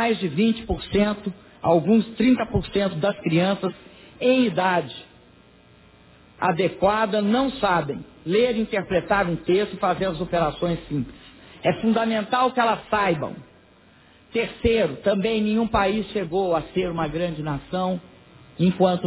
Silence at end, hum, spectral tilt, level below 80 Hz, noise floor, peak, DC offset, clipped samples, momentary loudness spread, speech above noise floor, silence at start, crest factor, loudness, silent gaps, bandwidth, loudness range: 0 s; none; -10.5 dB/octave; -44 dBFS; -53 dBFS; -6 dBFS; under 0.1%; under 0.1%; 8 LU; 31 dB; 0 s; 16 dB; -23 LUFS; none; 4 kHz; 2 LU